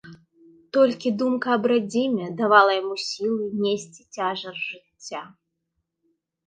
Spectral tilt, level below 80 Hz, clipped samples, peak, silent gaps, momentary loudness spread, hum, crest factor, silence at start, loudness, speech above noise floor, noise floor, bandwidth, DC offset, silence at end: -4.5 dB/octave; -74 dBFS; under 0.1%; -4 dBFS; none; 18 LU; none; 22 dB; 0.05 s; -23 LUFS; 55 dB; -78 dBFS; 9.6 kHz; under 0.1%; 1.2 s